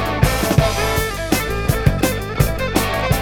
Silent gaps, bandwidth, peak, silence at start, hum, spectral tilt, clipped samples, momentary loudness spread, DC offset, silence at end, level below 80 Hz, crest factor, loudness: none; over 20 kHz; 0 dBFS; 0 s; none; -5 dB/octave; under 0.1%; 4 LU; under 0.1%; 0 s; -26 dBFS; 18 dB; -18 LUFS